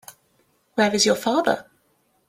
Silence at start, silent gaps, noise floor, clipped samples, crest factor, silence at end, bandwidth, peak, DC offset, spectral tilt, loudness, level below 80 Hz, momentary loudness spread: 0.75 s; none; -66 dBFS; under 0.1%; 20 dB; 0.65 s; 16 kHz; -4 dBFS; under 0.1%; -3 dB/octave; -21 LUFS; -64 dBFS; 10 LU